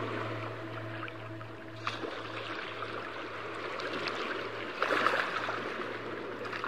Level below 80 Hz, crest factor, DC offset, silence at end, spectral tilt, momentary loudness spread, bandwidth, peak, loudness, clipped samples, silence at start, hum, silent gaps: -70 dBFS; 24 dB; 0.2%; 0 s; -5 dB/octave; 11 LU; 15.5 kHz; -12 dBFS; -36 LUFS; under 0.1%; 0 s; none; none